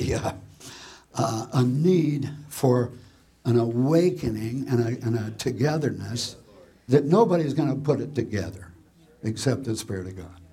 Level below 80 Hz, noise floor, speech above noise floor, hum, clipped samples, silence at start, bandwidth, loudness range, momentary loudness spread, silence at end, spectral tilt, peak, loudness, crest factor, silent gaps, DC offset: -52 dBFS; -54 dBFS; 30 dB; none; under 0.1%; 0 s; 16 kHz; 2 LU; 14 LU; 0.1 s; -6.5 dB/octave; -6 dBFS; -25 LUFS; 20 dB; none; under 0.1%